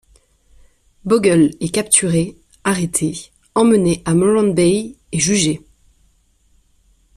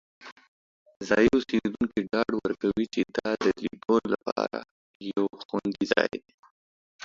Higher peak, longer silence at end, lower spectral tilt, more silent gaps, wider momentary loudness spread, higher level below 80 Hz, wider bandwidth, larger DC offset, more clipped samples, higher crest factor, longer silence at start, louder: first, 0 dBFS vs -4 dBFS; first, 1.6 s vs 0 s; about the same, -4.5 dB/octave vs -5.5 dB/octave; second, none vs 0.32-0.36 s, 0.48-0.86 s, 0.96-1.00 s, 4.32-4.36 s, 4.71-5.00 s, 5.45-5.49 s, 6.34-6.43 s, 6.51-6.99 s; about the same, 11 LU vs 10 LU; first, -48 dBFS vs -58 dBFS; first, 14 kHz vs 7.6 kHz; neither; neither; second, 18 dB vs 24 dB; first, 1.05 s vs 0.2 s; first, -16 LUFS vs -27 LUFS